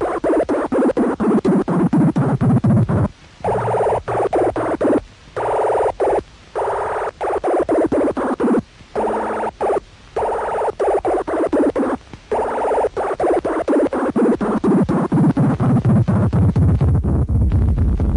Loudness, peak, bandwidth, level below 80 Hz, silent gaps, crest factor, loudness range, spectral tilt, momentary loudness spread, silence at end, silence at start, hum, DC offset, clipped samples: -18 LUFS; -6 dBFS; 10.5 kHz; -30 dBFS; none; 12 dB; 4 LU; -9 dB/octave; 7 LU; 0 s; 0 s; none; under 0.1%; under 0.1%